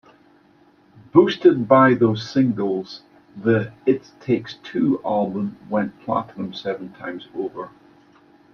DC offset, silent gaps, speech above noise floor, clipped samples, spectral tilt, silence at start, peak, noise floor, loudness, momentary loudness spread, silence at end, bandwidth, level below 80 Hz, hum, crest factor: under 0.1%; none; 35 dB; under 0.1%; -7.5 dB/octave; 1.15 s; -2 dBFS; -55 dBFS; -21 LUFS; 16 LU; 0.85 s; 6.6 kHz; -62 dBFS; none; 20 dB